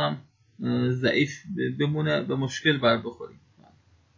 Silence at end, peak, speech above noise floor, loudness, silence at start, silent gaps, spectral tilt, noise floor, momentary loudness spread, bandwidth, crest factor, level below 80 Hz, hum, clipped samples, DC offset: 0.85 s; -8 dBFS; 34 dB; -26 LUFS; 0 s; none; -6 dB/octave; -60 dBFS; 15 LU; 7.6 kHz; 20 dB; -62 dBFS; none; under 0.1%; under 0.1%